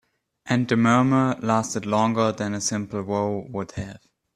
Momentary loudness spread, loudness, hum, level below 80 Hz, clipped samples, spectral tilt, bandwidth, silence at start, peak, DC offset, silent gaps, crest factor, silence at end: 13 LU; -23 LUFS; none; -58 dBFS; under 0.1%; -5.5 dB/octave; 12 kHz; 0.45 s; -4 dBFS; under 0.1%; none; 18 dB; 0.4 s